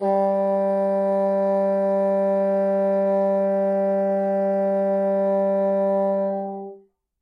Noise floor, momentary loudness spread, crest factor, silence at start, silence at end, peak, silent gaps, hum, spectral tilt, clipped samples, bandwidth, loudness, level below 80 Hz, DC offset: -49 dBFS; 2 LU; 10 dB; 0 s; 0.45 s; -12 dBFS; none; none; -10 dB/octave; under 0.1%; 4.9 kHz; -21 LUFS; -84 dBFS; under 0.1%